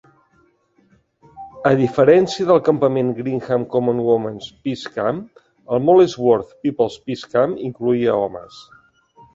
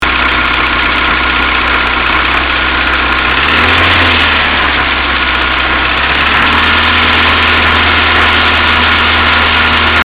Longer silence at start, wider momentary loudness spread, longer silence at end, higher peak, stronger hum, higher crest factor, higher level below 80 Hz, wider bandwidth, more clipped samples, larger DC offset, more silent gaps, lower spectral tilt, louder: first, 1.35 s vs 0 s; first, 13 LU vs 3 LU; first, 0.7 s vs 0 s; about the same, -2 dBFS vs 0 dBFS; neither; first, 18 dB vs 10 dB; second, -58 dBFS vs -24 dBFS; second, 7.8 kHz vs 13.5 kHz; neither; second, under 0.1% vs 2%; neither; first, -7 dB/octave vs -5 dB/octave; second, -18 LUFS vs -8 LUFS